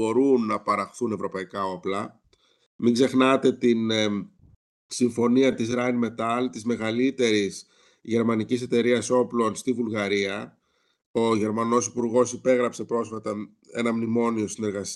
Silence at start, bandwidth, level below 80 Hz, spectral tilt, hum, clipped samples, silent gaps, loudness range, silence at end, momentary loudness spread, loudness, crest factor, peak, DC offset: 0 s; 12 kHz; -70 dBFS; -5 dB/octave; none; under 0.1%; 2.66-2.79 s, 4.56-4.89 s, 11.06-11.14 s; 2 LU; 0 s; 11 LU; -24 LUFS; 18 dB; -6 dBFS; under 0.1%